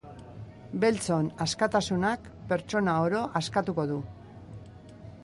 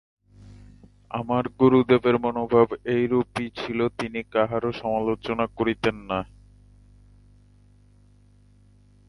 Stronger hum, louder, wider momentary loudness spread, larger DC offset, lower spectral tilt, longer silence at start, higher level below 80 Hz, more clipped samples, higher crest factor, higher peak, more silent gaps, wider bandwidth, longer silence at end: second, none vs 50 Hz at -50 dBFS; second, -29 LUFS vs -24 LUFS; first, 20 LU vs 11 LU; neither; second, -5.5 dB/octave vs -7.5 dB/octave; second, 0.05 s vs 0.45 s; about the same, -56 dBFS vs -52 dBFS; neither; about the same, 18 dB vs 22 dB; second, -12 dBFS vs -4 dBFS; neither; about the same, 11.5 kHz vs 11.5 kHz; second, 0 s vs 2.85 s